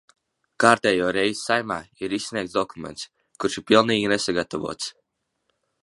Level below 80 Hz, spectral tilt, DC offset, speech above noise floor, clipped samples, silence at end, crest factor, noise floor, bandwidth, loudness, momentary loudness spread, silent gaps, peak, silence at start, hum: -60 dBFS; -3.5 dB/octave; under 0.1%; 52 dB; under 0.1%; 0.95 s; 24 dB; -75 dBFS; 11.5 kHz; -23 LUFS; 15 LU; none; 0 dBFS; 0.6 s; none